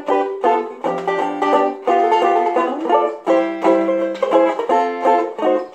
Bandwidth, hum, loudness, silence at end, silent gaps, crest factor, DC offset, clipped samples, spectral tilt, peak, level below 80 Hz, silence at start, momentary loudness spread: 9 kHz; none; -17 LUFS; 0 s; none; 14 dB; under 0.1%; under 0.1%; -5.5 dB/octave; -2 dBFS; -70 dBFS; 0 s; 5 LU